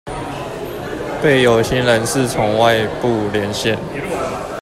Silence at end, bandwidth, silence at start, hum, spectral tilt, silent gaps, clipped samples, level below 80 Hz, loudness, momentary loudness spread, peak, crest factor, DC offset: 0 s; 16 kHz; 0.05 s; none; -4.5 dB/octave; none; under 0.1%; -40 dBFS; -17 LUFS; 13 LU; 0 dBFS; 16 dB; under 0.1%